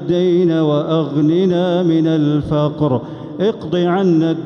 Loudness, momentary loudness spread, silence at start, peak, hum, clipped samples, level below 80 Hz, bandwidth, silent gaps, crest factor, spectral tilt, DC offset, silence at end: -16 LUFS; 5 LU; 0 s; -4 dBFS; none; under 0.1%; -48 dBFS; 6.8 kHz; none; 10 dB; -8.5 dB/octave; under 0.1%; 0 s